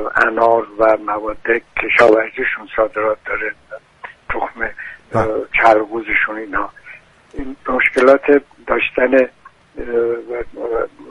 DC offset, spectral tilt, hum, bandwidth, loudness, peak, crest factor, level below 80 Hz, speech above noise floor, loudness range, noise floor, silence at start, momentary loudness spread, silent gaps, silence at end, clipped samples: under 0.1%; -6 dB/octave; none; 11 kHz; -16 LUFS; 0 dBFS; 16 dB; -42 dBFS; 25 dB; 3 LU; -41 dBFS; 0 s; 16 LU; none; 0 s; under 0.1%